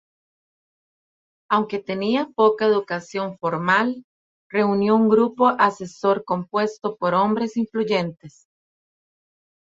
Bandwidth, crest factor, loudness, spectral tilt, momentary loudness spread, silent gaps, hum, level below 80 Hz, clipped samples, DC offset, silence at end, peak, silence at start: 7.8 kHz; 18 dB; -21 LUFS; -6.5 dB/octave; 9 LU; 4.04-4.50 s; none; -66 dBFS; under 0.1%; under 0.1%; 1.35 s; -4 dBFS; 1.5 s